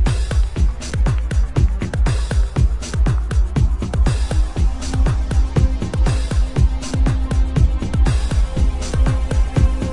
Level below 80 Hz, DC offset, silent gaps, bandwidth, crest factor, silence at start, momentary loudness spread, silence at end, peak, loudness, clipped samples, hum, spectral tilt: -18 dBFS; under 0.1%; none; 11 kHz; 12 dB; 0 s; 3 LU; 0 s; -4 dBFS; -19 LUFS; under 0.1%; none; -6.5 dB/octave